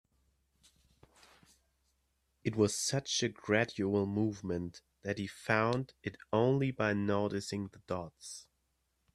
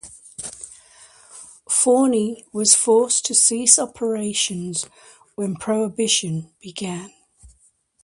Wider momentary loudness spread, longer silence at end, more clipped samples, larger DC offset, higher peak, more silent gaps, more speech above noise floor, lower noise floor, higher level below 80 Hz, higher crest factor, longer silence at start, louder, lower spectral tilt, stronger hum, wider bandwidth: second, 14 LU vs 20 LU; first, 0.75 s vs 0.6 s; neither; neither; second, -12 dBFS vs 0 dBFS; neither; first, 46 dB vs 40 dB; first, -79 dBFS vs -60 dBFS; second, -68 dBFS vs -62 dBFS; about the same, 22 dB vs 22 dB; first, 2.45 s vs 0.05 s; second, -34 LUFS vs -18 LUFS; first, -5 dB/octave vs -2.5 dB/octave; neither; first, 13 kHz vs 11.5 kHz